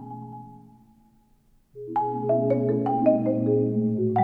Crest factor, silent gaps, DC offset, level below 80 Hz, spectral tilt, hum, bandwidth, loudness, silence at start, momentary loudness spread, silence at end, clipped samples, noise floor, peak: 18 dB; none; under 0.1%; -62 dBFS; -12 dB/octave; none; 3.8 kHz; -24 LUFS; 0 s; 18 LU; 0 s; under 0.1%; -61 dBFS; -8 dBFS